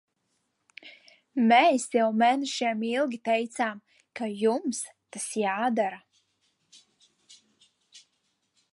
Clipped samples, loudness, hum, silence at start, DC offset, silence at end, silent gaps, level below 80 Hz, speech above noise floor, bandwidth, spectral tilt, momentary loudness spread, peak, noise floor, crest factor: under 0.1%; -26 LUFS; none; 0.85 s; under 0.1%; 0.75 s; none; -84 dBFS; 51 dB; 11.5 kHz; -3.5 dB/octave; 23 LU; -8 dBFS; -76 dBFS; 22 dB